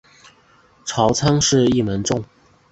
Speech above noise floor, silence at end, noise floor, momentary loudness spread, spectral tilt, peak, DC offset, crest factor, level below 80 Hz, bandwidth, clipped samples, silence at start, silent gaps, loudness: 36 dB; 0.45 s; -54 dBFS; 11 LU; -4.5 dB/octave; -2 dBFS; under 0.1%; 18 dB; -44 dBFS; 8.2 kHz; under 0.1%; 0.85 s; none; -18 LUFS